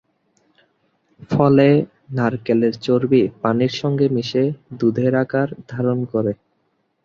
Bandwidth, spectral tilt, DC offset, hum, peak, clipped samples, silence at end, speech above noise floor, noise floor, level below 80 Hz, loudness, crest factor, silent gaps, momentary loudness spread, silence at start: 7.2 kHz; -8 dB/octave; under 0.1%; none; -2 dBFS; under 0.1%; 0.7 s; 50 dB; -67 dBFS; -56 dBFS; -19 LUFS; 18 dB; none; 9 LU; 1.2 s